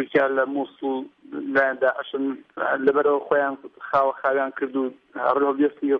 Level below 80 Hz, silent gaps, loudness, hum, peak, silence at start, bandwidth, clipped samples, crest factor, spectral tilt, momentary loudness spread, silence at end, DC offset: -70 dBFS; none; -23 LUFS; none; -6 dBFS; 0 s; 5.2 kHz; under 0.1%; 16 dB; -7.5 dB/octave; 9 LU; 0 s; under 0.1%